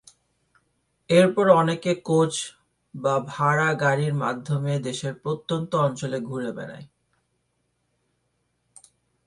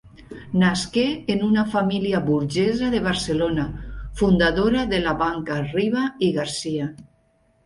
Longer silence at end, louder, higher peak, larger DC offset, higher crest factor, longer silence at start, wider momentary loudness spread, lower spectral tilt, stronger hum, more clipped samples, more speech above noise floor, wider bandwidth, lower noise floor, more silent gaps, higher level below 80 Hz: first, 2.4 s vs 0.6 s; about the same, -23 LUFS vs -22 LUFS; first, -2 dBFS vs -6 dBFS; neither; first, 22 dB vs 16 dB; first, 1.1 s vs 0.05 s; first, 13 LU vs 8 LU; about the same, -5.5 dB/octave vs -5.5 dB/octave; neither; neither; first, 50 dB vs 41 dB; about the same, 11.5 kHz vs 11.5 kHz; first, -73 dBFS vs -62 dBFS; neither; second, -66 dBFS vs -40 dBFS